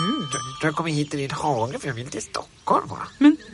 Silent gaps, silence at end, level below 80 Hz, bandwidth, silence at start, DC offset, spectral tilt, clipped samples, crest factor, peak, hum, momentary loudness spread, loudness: none; 0 s; -56 dBFS; 11.5 kHz; 0 s; under 0.1%; -5 dB/octave; under 0.1%; 18 dB; -4 dBFS; none; 13 LU; -24 LUFS